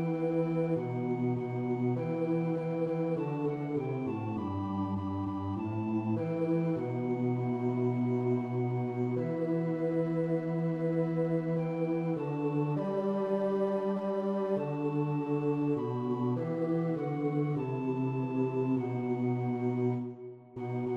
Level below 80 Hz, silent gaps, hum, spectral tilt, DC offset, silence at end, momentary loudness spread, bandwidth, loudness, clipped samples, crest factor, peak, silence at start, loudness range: -72 dBFS; none; none; -10.5 dB/octave; under 0.1%; 0 s; 4 LU; 6.2 kHz; -32 LUFS; under 0.1%; 12 dB; -18 dBFS; 0 s; 2 LU